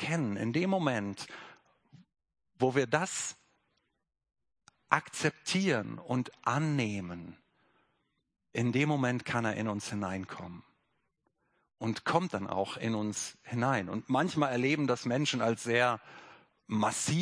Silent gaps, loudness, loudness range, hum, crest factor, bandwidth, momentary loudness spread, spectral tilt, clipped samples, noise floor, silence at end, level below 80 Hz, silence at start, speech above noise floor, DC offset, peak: none; -32 LUFS; 5 LU; none; 26 dB; 10.5 kHz; 11 LU; -5 dB/octave; under 0.1%; -79 dBFS; 0 s; -72 dBFS; 0 s; 47 dB; under 0.1%; -8 dBFS